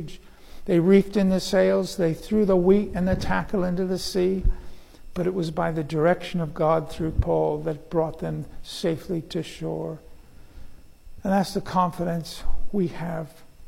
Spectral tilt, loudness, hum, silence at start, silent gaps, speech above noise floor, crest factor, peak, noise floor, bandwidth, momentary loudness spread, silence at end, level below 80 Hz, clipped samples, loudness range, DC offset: -6.5 dB/octave; -24 LUFS; none; 0 s; none; 21 dB; 18 dB; -6 dBFS; -44 dBFS; 16 kHz; 14 LU; 0 s; -36 dBFS; under 0.1%; 8 LU; under 0.1%